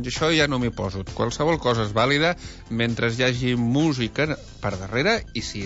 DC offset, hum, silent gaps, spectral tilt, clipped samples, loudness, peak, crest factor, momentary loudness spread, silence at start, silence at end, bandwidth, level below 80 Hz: under 0.1%; none; none; -5 dB/octave; under 0.1%; -23 LUFS; -8 dBFS; 14 dB; 10 LU; 0 s; 0 s; 8 kHz; -42 dBFS